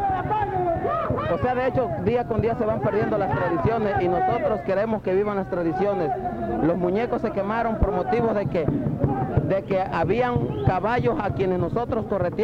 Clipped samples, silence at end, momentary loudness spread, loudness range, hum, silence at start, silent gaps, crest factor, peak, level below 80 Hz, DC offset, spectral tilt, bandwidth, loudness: under 0.1%; 0 s; 3 LU; 1 LU; none; 0 s; none; 16 dB; -6 dBFS; -40 dBFS; under 0.1%; -9 dB/octave; 7.2 kHz; -24 LUFS